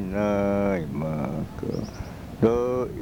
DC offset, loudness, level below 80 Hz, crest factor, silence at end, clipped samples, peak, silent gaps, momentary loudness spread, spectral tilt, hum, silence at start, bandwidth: under 0.1%; -26 LUFS; -44 dBFS; 18 dB; 0 s; under 0.1%; -8 dBFS; none; 11 LU; -8 dB/octave; none; 0 s; 19 kHz